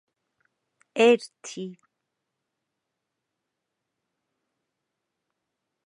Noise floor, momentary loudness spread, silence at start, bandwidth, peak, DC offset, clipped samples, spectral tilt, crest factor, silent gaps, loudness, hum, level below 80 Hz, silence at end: -83 dBFS; 19 LU; 0.95 s; 11 kHz; -6 dBFS; under 0.1%; under 0.1%; -4 dB/octave; 24 dB; none; -21 LUFS; none; -88 dBFS; 4.15 s